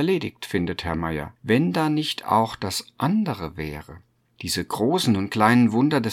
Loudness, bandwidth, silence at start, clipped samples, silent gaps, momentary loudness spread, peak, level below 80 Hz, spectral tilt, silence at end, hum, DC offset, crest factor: -23 LUFS; 16.5 kHz; 0 s; under 0.1%; none; 12 LU; -2 dBFS; -50 dBFS; -5.5 dB/octave; 0 s; none; under 0.1%; 20 dB